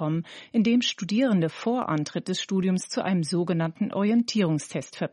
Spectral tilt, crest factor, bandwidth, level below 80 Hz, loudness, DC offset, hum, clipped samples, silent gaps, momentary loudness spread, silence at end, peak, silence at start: -5.5 dB/octave; 14 dB; 11.5 kHz; -72 dBFS; -26 LUFS; under 0.1%; none; under 0.1%; none; 7 LU; 0.05 s; -12 dBFS; 0 s